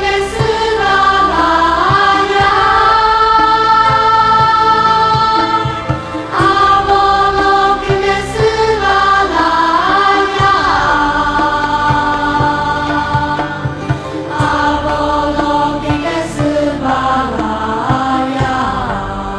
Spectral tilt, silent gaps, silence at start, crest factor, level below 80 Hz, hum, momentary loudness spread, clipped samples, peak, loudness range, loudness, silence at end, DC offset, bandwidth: -5 dB/octave; none; 0 s; 12 dB; -30 dBFS; none; 8 LU; under 0.1%; 0 dBFS; 6 LU; -12 LUFS; 0 s; under 0.1%; 11 kHz